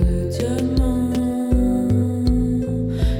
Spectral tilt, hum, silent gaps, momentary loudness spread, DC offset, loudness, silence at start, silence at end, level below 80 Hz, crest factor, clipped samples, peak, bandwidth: -8 dB/octave; none; none; 3 LU; under 0.1%; -20 LUFS; 0 s; 0 s; -24 dBFS; 12 dB; under 0.1%; -6 dBFS; 16 kHz